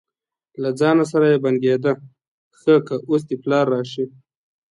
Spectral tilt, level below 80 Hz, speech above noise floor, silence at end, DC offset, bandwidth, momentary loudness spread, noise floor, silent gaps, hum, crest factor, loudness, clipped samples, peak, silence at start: -7 dB/octave; -68 dBFS; 58 dB; 0.65 s; under 0.1%; 11 kHz; 11 LU; -76 dBFS; 2.28-2.51 s; none; 16 dB; -19 LUFS; under 0.1%; -4 dBFS; 0.6 s